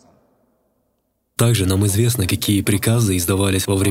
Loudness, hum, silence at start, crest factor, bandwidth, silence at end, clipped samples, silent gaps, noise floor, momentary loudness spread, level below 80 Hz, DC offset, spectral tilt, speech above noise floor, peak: -17 LUFS; none; 1.4 s; 16 dB; 16.5 kHz; 0 s; under 0.1%; none; -69 dBFS; 2 LU; -46 dBFS; under 0.1%; -5 dB/octave; 52 dB; -2 dBFS